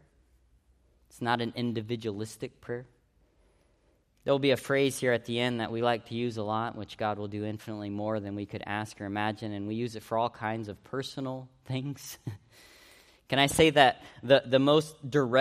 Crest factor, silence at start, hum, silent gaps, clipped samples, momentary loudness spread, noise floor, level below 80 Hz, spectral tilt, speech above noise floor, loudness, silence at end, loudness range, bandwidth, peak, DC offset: 24 dB; 1.15 s; none; none; under 0.1%; 15 LU; -68 dBFS; -62 dBFS; -5 dB/octave; 39 dB; -30 LUFS; 0 s; 10 LU; 15 kHz; -6 dBFS; under 0.1%